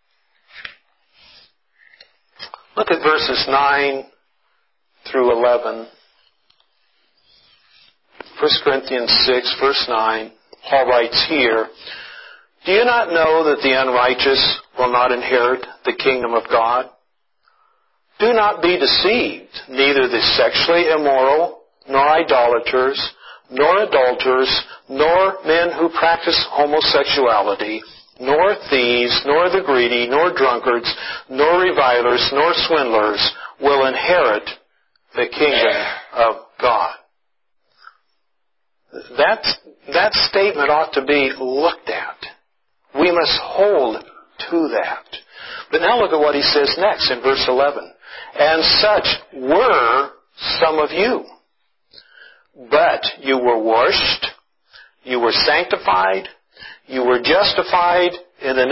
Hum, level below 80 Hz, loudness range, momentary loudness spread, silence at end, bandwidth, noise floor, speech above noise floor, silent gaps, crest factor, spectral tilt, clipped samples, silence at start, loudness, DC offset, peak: none; -50 dBFS; 5 LU; 12 LU; 0 s; 5.8 kHz; -76 dBFS; 60 dB; none; 16 dB; -6.5 dB/octave; under 0.1%; 0.55 s; -16 LUFS; under 0.1%; -2 dBFS